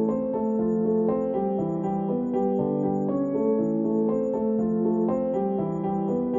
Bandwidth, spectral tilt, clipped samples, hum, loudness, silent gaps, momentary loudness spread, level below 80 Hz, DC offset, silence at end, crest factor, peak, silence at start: 7.2 kHz; -11.5 dB/octave; under 0.1%; none; -25 LUFS; none; 3 LU; -56 dBFS; under 0.1%; 0 s; 12 dB; -12 dBFS; 0 s